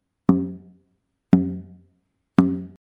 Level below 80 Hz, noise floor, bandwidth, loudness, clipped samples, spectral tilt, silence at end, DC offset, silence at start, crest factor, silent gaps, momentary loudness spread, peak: -54 dBFS; -70 dBFS; 5.2 kHz; -22 LUFS; under 0.1%; -10 dB/octave; 0.15 s; under 0.1%; 0.3 s; 22 dB; none; 14 LU; -2 dBFS